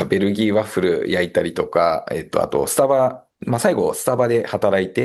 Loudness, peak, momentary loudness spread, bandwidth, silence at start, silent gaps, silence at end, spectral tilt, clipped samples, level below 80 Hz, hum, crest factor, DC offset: -19 LUFS; -2 dBFS; 5 LU; 13 kHz; 0 s; none; 0 s; -5 dB/octave; under 0.1%; -52 dBFS; none; 18 dB; under 0.1%